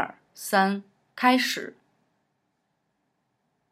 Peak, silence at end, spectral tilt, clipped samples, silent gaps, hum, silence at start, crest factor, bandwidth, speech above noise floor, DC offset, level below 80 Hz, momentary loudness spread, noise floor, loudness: -6 dBFS; 2 s; -3.5 dB/octave; under 0.1%; none; none; 0 s; 24 dB; 16 kHz; 52 dB; under 0.1%; -88 dBFS; 15 LU; -76 dBFS; -25 LUFS